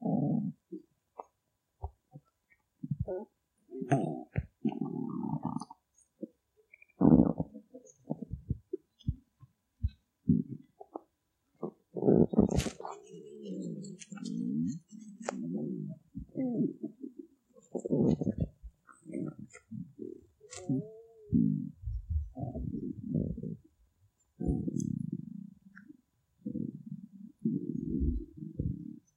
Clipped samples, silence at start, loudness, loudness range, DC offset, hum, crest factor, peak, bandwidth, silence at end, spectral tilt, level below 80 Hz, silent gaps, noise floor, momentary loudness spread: under 0.1%; 0 s; -35 LUFS; 7 LU; under 0.1%; none; 26 dB; -10 dBFS; 12 kHz; 0.15 s; -8 dB/octave; -48 dBFS; none; -81 dBFS; 20 LU